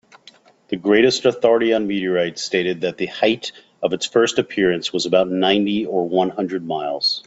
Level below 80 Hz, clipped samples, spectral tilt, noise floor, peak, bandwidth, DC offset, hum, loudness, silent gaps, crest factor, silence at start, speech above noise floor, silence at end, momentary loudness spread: -60 dBFS; under 0.1%; -4 dB/octave; -50 dBFS; -2 dBFS; 8 kHz; under 0.1%; none; -19 LUFS; none; 18 dB; 0.7 s; 31 dB; 0.05 s; 9 LU